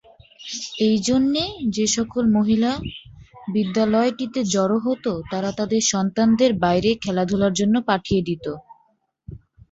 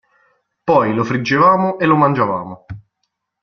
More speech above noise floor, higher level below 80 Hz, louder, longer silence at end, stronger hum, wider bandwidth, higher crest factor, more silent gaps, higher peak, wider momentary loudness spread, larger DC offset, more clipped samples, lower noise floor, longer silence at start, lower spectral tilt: second, 44 dB vs 58 dB; first, -48 dBFS vs -54 dBFS; second, -21 LUFS vs -15 LUFS; second, 0.35 s vs 0.65 s; neither; first, 8 kHz vs 6.8 kHz; about the same, 18 dB vs 16 dB; neither; about the same, -4 dBFS vs -2 dBFS; second, 11 LU vs 21 LU; neither; neither; second, -64 dBFS vs -73 dBFS; second, 0.4 s vs 0.65 s; second, -4.5 dB/octave vs -7.5 dB/octave